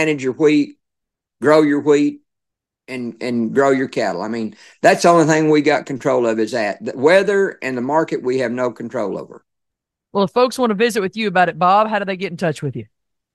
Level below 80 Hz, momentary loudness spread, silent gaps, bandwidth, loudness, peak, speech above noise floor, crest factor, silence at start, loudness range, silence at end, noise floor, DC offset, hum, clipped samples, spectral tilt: -66 dBFS; 12 LU; none; 12.5 kHz; -17 LUFS; 0 dBFS; 65 dB; 18 dB; 0 s; 5 LU; 0.5 s; -82 dBFS; under 0.1%; none; under 0.1%; -5.5 dB/octave